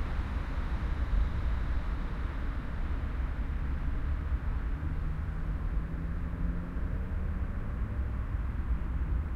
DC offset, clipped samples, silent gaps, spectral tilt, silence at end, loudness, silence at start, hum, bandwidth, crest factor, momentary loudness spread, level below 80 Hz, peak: under 0.1%; under 0.1%; none; -8.5 dB/octave; 0 s; -36 LUFS; 0 s; none; 5.6 kHz; 12 dB; 3 LU; -32 dBFS; -18 dBFS